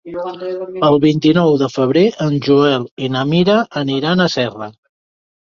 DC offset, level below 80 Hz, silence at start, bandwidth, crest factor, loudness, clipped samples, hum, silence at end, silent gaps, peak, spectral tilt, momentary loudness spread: under 0.1%; -54 dBFS; 0.05 s; 7.2 kHz; 14 dB; -15 LUFS; under 0.1%; none; 0.85 s; 2.91-2.97 s; -2 dBFS; -7 dB/octave; 12 LU